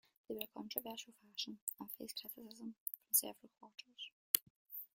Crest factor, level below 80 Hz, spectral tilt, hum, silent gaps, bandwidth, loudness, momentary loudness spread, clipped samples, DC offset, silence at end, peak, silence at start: 40 dB; -88 dBFS; -1 dB/octave; none; 1.62-1.67 s, 2.80-2.86 s, 4.12-4.34 s, 4.42-4.66 s; 17 kHz; -42 LUFS; 18 LU; under 0.1%; under 0.1%; 0.1 s; -6 dBFS; 0.3 s